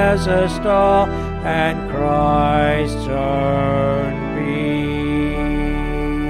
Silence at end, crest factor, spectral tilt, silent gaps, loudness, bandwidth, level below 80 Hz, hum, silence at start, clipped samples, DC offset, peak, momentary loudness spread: 0 s; 14 dB; -7 dB/octave; none; -18 LUFS; 13.5 kHz; -28 dBFS; none; 0 s; under 0.1%; under 0.1%; -4 dBFS; 6 LU